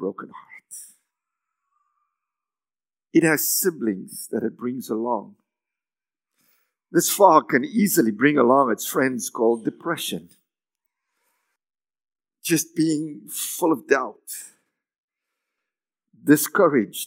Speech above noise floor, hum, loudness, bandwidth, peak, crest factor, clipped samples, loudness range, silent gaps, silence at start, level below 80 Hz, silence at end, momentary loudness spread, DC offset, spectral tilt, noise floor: over 69 dB; none; -21 LUFS; 16.5 kHz; -2 dBFS; 22 dB; under 0.1%; 9 LU; 14.98-15.08 s; 0 s; -84 dBFS; 0 s; 16 LU; under 0.1%; -4 dB/octave; under -90 dBFS